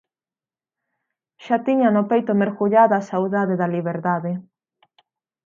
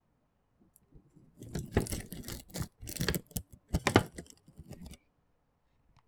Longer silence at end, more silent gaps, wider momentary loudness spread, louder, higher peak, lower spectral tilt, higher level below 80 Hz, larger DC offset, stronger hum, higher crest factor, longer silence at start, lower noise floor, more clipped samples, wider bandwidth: about the same, 1.05 s vs 1.1 s; neither; second, 8 LU vs 24 LU; first, -20 LUFS vs -35 LUFS; first, -2 dBFS vs -6 dBFS; first, -8.5 dB/octave vs -4.5 dB/octave; second, -74 dBFS vs -48 dBFS; neither; neither; second, 18 dB vs 32 dB; first, 1.4 s vs 0.95 s; first, under -90 dBFS vs -75 dBFS; neither; second, 7.2 kHz vs over 20 kHz